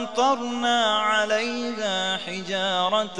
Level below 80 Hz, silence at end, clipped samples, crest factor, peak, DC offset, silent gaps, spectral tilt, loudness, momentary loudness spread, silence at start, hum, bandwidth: -72 dBFS; 0 s; under 0.1%; 16 dB; -8 dBFS; 0.4%; none; -2.5 dB/octave; -23 LUFS; 7 LU; 0 s; none; 11 kHz